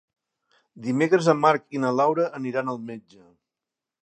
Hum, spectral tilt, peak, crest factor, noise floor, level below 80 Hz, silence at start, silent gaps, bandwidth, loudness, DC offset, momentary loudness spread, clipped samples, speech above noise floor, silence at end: none; -6.5 dB/octave; -4 dBFS; 22 dB; -88 dBFS; -78 dBFS; 0.75 s; none; 9.6 kHz; -23 LUFS; under 0.1%; 15 LU; under 0.1%; 65 dB; 1 s